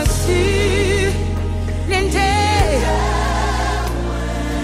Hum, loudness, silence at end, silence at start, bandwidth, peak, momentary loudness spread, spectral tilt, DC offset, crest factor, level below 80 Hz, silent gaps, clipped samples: none; -18 LUFS; 0 s; 0 s; 15.5 kHz; -2 dBFS; 7 LU; -5 dB/octave; under 0.1%; 14 dB; -22 dBFS; none; under 0.1%